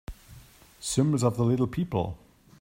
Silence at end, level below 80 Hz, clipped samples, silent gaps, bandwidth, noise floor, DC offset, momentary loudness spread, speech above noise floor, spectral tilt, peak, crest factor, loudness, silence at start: 0.45 s; -50 dBFS; under 0.1%; none; 16 kHz; -52 dBFS; under 0.1%; 15 LU; 26 dB; -6.5 dB/octave; -10 dBFS; 18 dB; -27 LUFS; 0.1 s